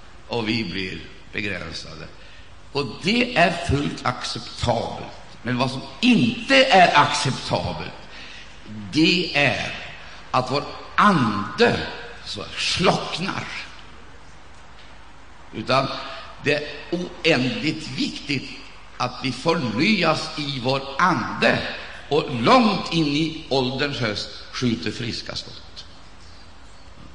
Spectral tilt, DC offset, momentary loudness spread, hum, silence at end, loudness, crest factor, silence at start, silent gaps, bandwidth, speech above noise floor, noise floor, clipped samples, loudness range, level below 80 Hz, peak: -4.5 dB/octave; 0.8%; 18 LU; none; 0 s; -22 LUFS; 20 dB; 0.15 s; none; 10 kHz; 24 dB; -46 dBFS; under 0.1%; 8 LU; -48 dBFS; -2 dBFS